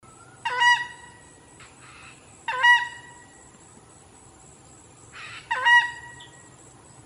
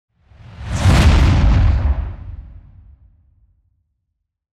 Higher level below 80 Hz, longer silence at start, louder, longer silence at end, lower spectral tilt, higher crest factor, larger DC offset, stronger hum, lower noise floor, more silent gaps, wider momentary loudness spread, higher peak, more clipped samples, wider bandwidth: second, -64 dBFS vs -20 dBFS; about the same, 0.45 s vs 0.5 s; second, -20 LUFS vs -15 LUFS; second, 0.8 s vs 2.1 s; second, 0 dB/octave vs -6 dB/octave; first, 20 dB vs 14 dB; neither; neither; second, -51 dBFS vs -74 dBFS; neither; first, 27 LU vs 22 LU; second, -6 dBFS vs -2 dBFS; neither; about the same, 13 kHz vs 12 kHz